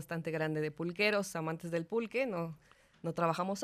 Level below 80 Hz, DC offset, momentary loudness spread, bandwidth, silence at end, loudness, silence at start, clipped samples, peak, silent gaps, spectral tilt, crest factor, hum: -74 dBFS; under 0.1%; 10 LU; 14.5 kHz; 0 s; -35 LUFS; 0 s; under 0.1%; -18 dBFS; none; -5.5 dB/octave; 18 dB; none